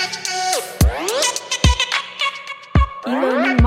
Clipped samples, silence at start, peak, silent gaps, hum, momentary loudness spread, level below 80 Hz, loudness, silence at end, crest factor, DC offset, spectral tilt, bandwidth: under 0.1%; 0 s; 0 dBFS; none; none; 5 LU; -24 dBFS; -19 LUFS; 0 s; 18 dB; under 0.1%; -4 dB/octave; 16 kHz